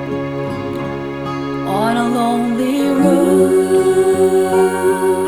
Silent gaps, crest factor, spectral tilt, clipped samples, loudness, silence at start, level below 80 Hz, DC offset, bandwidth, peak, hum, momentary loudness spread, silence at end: none; 14 dB; -6 dB/octave; under 0.1%; -15 LUFS; 0 s; -48 dBFS; under 0.1%; 17.5 kHz; 0 dBFS; none; 10 LU; 0 s